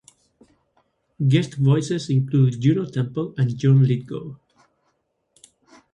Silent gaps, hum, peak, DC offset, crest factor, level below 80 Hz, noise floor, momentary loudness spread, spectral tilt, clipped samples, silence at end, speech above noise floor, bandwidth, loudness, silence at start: none; none; -4 dBFS; under 0.1%; 18 dB; -60 dBFS; -71 dBFS; 9 LU; -8 dB/octave; under 0.1%; 1.6 s; 51 dB; 9.2 kHz; -20 LUFS; 1.2 s